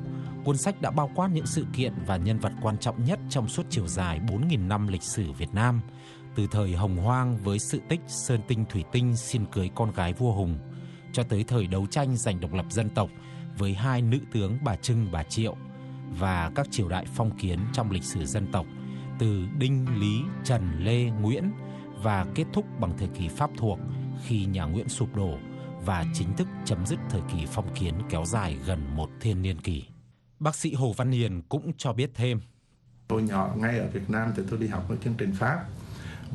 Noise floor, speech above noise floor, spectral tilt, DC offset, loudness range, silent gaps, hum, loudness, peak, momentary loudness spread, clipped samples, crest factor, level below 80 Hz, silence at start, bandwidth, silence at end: -59 dBFS; 31 dB; -6 dB/octave; under 0.1%; 2 LU; none; none; -29 LUFS; -8 dBFS; 6 LU; under 0.1%; 20 dB; -46 dBFS; 0 s; 12 kHz; 0 s